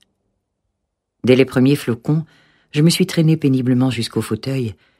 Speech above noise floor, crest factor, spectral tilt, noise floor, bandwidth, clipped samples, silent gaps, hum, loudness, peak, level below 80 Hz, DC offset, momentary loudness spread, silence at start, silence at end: 59 dB; 18 dB; -6.5 dB/octave; -75 dBFS; 15.5 kHz; under 0.1%; none; none; -17 LUFS; 0 dBFS; -56 dBFS; under 0.1%; 9 LU; 1.25 s; 0.25 s